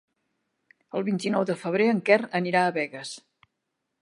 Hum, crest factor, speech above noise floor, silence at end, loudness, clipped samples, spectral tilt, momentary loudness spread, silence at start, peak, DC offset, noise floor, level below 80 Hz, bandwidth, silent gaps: none; 22 dB; 56 dB; 0.8 s; -25 LUFS; under 0.1%; -5.5 dB/octave; 14 LU; 0.95 s; -4 dBFS; under 0.1%; -81 dBFS; -80 dBFS; 11.5 kHz; none